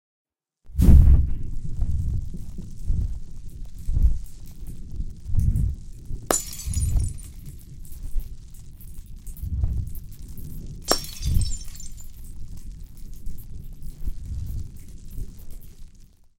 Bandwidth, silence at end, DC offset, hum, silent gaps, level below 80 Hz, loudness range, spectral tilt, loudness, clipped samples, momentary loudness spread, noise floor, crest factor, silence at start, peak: 17 kHz; 0.35 s; under 0.1%; none; none; -26 dBFS; 16 LU; -5 dB/octave; -26 LUFS; under 0.1%; 19 LU; -49 dBFS; 24 dB; 0.65 s; 0 dBFS